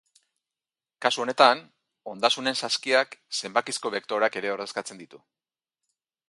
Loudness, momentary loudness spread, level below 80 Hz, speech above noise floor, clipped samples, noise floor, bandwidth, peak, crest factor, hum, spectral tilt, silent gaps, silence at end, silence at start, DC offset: -25 LUFS; 14 LU; -80 dBFS; over 64 dB; under 0.1%; under -90 dBFS; 11.5 kHz; -2 dBFS; 26 dB; none; -1.5 dB/octave; none; 1.15 s; 1 s; under 0.1%